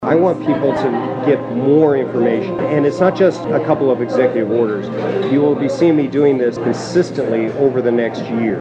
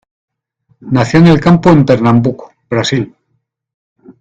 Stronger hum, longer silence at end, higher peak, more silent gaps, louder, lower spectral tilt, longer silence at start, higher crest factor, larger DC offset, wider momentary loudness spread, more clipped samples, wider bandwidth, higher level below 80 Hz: neither; about the same, 0 s vs 0.1 s; about the same, -2 dBFS vs 0 dBFS; second, none vs 3.74-3.96 s; second, -16 LUFS vs -10 LUFS; about the same, -7.5 dB/octave vs -7 dB/octave; second, 0 s vs 0.85 s; about the same, 14 dB vs 12 dB; neither; second, 5 LU vs 11 LU; second, under 0.1% vs 0.5%; first, 8.8 kHz vs 7.8 kHz; second, -56 dBFS vs -40 dBFS